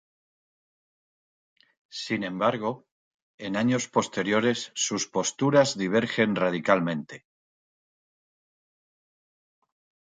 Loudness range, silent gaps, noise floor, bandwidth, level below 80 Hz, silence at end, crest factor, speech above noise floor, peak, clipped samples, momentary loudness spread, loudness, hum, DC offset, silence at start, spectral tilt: 9 LU; 2.91-3.38 s; under -90 dBFS; 9.6 kHz; -70 dBFS; 2.9 s; 24 dB; over 64 dB; -6 dBFS; under 0.1%; 12 LU; -26 LUFS; none; under 0.1%; 1.95 s; -4 dB/octave